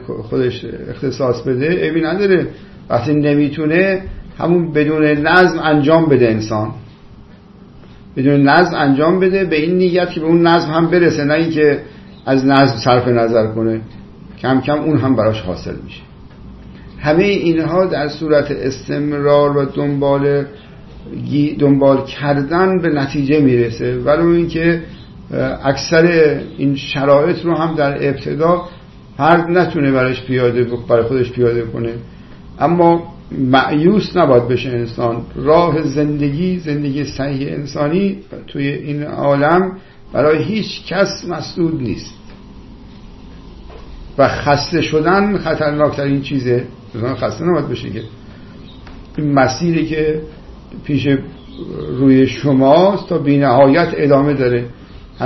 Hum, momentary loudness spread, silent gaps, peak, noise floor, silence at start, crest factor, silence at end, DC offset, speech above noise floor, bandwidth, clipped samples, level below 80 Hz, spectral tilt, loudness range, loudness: none; 12 LU; none; 0 dBFS; -40 dBFS; 0 s; 14 dB; 0 s; under 0.1%; 26 dB; 6.2 kHz; under 0.1%; -40 dBFS; -7.5 dB/octave; 6 LU; -15 LUFS